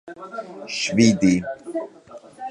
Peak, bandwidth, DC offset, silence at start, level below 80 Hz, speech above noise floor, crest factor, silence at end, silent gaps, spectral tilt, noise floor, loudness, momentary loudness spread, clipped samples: -2 dBFS; 10.5 kHz; under 0.1%; 0.05 s; -54 dBFS; 24 dB; 20 dB; 0 s; none; -5 dB/octave; -44 dBFS; -21 LUFS; 19 LU; under 0.1%